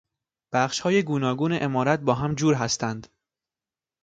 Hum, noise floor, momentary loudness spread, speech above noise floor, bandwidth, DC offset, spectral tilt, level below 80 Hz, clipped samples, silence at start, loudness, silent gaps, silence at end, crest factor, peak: none; under -90 dBFS; 5 LU; over 66 dB; 9.2 kHz; under 0.1%; -5 dB/octave; -58 dBFS; under 0.1%; 0.5 s; -24 LUFS; none; 1 s; 20 dB; -6 dBFS